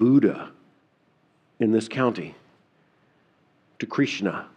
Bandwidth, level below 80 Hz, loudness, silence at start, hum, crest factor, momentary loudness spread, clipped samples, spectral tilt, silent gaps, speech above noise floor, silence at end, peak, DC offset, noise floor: 9.8 kHz; -74 dBFS; -24 LUFS; 0 s; none; 18 dB; 16 LU; under 0.1%; -6.5 dB/octave; none; 42 dB; 0.1 s; -8 dBFS; under 0.1%; -65 dBFS